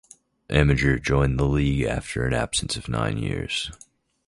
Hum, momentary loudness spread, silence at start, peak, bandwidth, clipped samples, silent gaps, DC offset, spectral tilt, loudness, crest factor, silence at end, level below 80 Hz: none; 7 LU; 0.5 s; -4 dBFS; 11.5 kHz; under 0.1%; none; under 0.1%; -5.5 dB/octave; -24 LUFS; 20 dB; 0.55 s; -34 dBFS